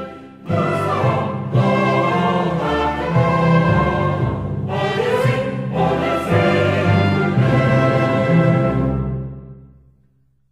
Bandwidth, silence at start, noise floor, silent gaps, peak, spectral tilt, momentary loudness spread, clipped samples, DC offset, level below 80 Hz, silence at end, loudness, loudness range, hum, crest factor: 11.5 kHz; 0 s; -59 dBFS; none; -4 dBFS; -8 dB/octave; 8 LU; under 0.1%; under 0.1%; -38 dBFS; 0.85 s; -17 LUFS; 2 LU; none; 14 dB